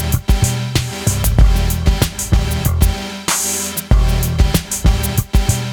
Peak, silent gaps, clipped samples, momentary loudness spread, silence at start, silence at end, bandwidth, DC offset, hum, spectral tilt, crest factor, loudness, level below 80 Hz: 0 dBFS; none; under 0.1%; 4 LU; 0 s; 0 s; over 20 kHz; under 0.1%; none; -4.5 dB/octave; 14 dB; -16 LUFS; -18 dBFS